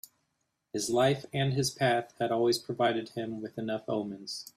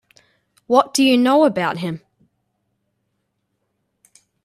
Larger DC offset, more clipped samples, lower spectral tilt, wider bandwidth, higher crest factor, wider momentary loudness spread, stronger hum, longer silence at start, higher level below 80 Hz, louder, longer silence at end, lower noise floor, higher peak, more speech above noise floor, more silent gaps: neither; neither; about the same, -5 dB/octave vs -4.5 dB/octave; about the same, 15 kHz vs 14 kHz; about the same, 18 dB vs 20 dB; second, 10 LU vs 14 LU; neither; about the same, 0.75 s vs 0.7 s; about the same, -68 dBFS vs -68 dBFS; second, -31 LUFS vs -17 LUFS; second, 0.1 s vs 2.5 s; first, -80 dBFS vs -72 dBFS; second, -14 dBFS vs 0 dBFS; second, 49 dB vs 57 dB; neither